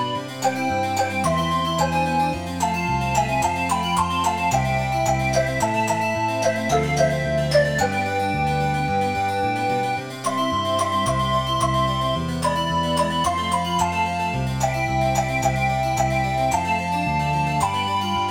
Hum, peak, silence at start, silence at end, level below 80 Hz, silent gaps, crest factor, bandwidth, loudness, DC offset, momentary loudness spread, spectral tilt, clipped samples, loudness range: none; -6 dBFS; 0 s; 0 s; -38 dBFS; none; 16 dB; over 20 kHz; -22 LUFS; 0.2%; 3 LU; -4.5 dB/octave; under 0.1%; 1 LU